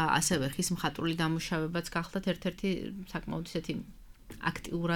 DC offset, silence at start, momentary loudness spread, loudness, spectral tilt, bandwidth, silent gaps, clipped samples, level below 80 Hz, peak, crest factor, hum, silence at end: under 0.1%; 0 s; 10 LU; -33 LUFS; -4.5 dB/octave; 19 kHz; none; under 0.1%; -52 dBFS; -12 dBFS; 20 dB; none; 0 s